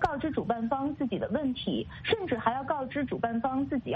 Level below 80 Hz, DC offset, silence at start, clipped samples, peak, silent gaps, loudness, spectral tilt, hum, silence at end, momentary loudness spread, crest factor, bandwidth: -54 dBFS; under 0.1%; 0 s; under 0.1%; -10 dBFS; none; -31 LUFS; -8 dB/octave; none; 0 s; 3 LU; 20 dB; 7.8 kHz